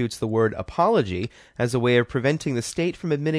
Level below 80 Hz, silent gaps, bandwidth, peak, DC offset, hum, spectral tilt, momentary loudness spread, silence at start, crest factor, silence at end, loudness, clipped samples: -50 dBFS; none; 11 kHz; -6 dBFS; under 0.1%; none; -6 dB/octave; 8 LU; 0 s; 16 dB; 0 s; -23 LUFS; under 0.1%